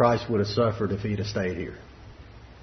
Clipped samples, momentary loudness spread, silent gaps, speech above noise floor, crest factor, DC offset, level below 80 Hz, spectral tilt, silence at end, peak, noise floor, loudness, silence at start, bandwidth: under 0.1%; 24 LU; none; 21 dB; 20 dB; under 0.1%; -50 dBFS; -7 dB/octave; 0 s; -8 dBFS; -46 dBFS; -27 LUFS; 0 s; 6.4 kHz